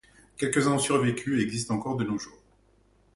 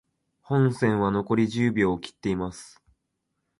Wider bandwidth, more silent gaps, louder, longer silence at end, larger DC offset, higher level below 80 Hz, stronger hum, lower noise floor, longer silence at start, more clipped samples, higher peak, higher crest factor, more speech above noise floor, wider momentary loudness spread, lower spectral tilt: about the same, 11.5 kHz vs 11.5 kHz; neither; about the same, -27 LUFS vs -25 LUFS; about the same, 0.85 s vs 0.9 s; neither; second, -60 dBFS vs -54 dBFS; neither; second, -63 dBFS vs -79 dBFS; about the same, 0.4 s vs 0.5 s; neither; about the same, -10 dBFS vs -10 dBFS; about the same, 18 dB vs 16 dB; second, 36 dB vs 54 dB; about the same, 8 LU vs 8 LU; second, -5 dB/octave vs -7 dB/octave